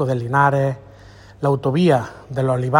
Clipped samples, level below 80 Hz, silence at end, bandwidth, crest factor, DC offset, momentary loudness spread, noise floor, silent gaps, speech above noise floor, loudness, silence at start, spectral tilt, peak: under 0.1%; -52 dBFS; 0 s; 15.5 kHz; 18 dB; under 0.1%; 8 LU; -43 dBFS; none; 25 dB; -19 LUFS; 0 s; -7.5 dB/octave; 0 dBFS